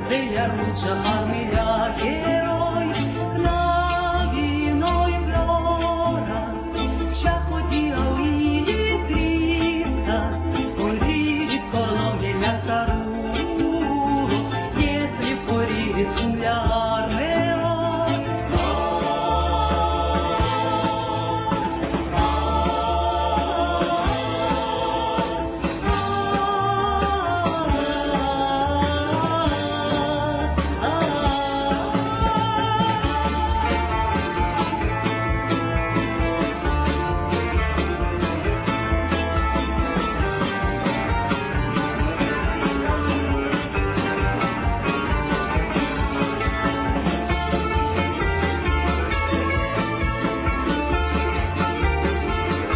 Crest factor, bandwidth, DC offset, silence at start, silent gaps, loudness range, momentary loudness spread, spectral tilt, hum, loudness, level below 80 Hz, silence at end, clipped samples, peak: 14 dB; 4 kHz; under 0.1%; 0 s; none; 1 LU; 3 LU; -10.5 dB/octave; none; -22 LUFS; -30 dBFS; 0 s; under 0.1%; -8 dBFS